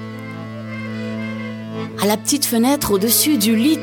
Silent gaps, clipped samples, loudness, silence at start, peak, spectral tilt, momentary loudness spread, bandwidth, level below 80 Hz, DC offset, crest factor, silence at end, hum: none; under 0.1%; -18 LUFS; 0 s; -2 dBFS; -3.5 dB/octave; 16 LU; 19.5 kHz; -50 dBFS; under 0.1%; 16 dB; 0 s; none